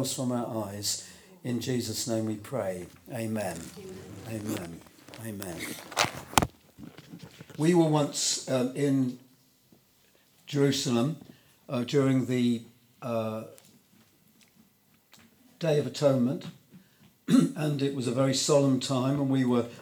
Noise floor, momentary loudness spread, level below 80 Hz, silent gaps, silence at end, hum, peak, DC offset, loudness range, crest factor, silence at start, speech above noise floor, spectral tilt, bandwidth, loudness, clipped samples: -65 dBFS; 19 LU; -60 dBFS; none; 0 s; none; 0 dBFS; under 0.1%; 8 LU; 28 dB; 0 s; 36 dB; -5 dB/octave; over 20 kHz; -28 LUFS; under 0.1%